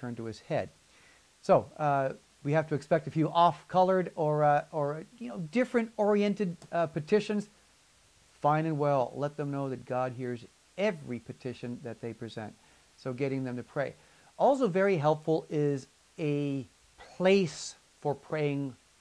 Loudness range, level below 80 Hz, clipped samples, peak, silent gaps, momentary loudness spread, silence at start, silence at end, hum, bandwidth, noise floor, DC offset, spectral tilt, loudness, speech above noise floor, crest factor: 9 LU; -70 dBFS; under 0.1%; -12 dBFS; none; 15 LU; 0 s; 0.25 s; none; 11 kHz; -63 dBFS; under 0.1%; -6.5 dB/octave; -31 LUFS; 34 dB; 20 dB